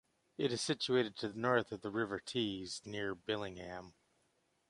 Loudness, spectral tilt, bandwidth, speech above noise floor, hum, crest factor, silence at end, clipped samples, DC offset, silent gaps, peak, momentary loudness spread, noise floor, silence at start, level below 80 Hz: -38 LUFS; -4.5 dB/octave; 11.5 kHz; 40 dB; none; 22 dB; 0.8 s; under 0.1%; under 0.1%; none; -18 dBFS; 12 LU; -78 dBFS; 0.4 s; -70 dBFS